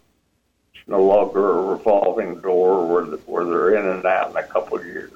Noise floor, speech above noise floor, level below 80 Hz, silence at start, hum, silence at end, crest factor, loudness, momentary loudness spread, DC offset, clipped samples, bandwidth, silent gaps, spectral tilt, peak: -67 dBFS; 48 dB; -58 dBFS; 0.75 s; none; 0.1 s; 14 dB; -19 LUFS; 8 LU; under 0.1%; under 0.1%; 7.4 kHz; none; -7.5 dB/octave; -6 dBFS